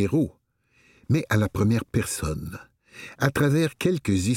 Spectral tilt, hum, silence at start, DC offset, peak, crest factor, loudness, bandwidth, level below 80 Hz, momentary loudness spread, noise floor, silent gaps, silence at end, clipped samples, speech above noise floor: -6 dB/octave; none; 0 s; under 0.1%; -6 dBFS; 18 dB; -25 LUFS; 17 kHz; -46 dBFS; 15 LU; -63 dBFS; none; 0 s; under 0.1%; 40 dB